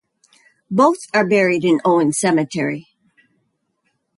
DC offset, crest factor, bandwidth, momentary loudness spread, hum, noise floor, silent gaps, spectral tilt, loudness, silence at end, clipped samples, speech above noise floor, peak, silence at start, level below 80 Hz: under 0.1%; 16 dB; 11.5 kHz; 8 LU; none; -69 dBFS; none; -5 dB/octave; -17 LUFS; 1.35 s; under 0.1%; 53 dB; -2 dBFS; 0.7 s; -64 dBFS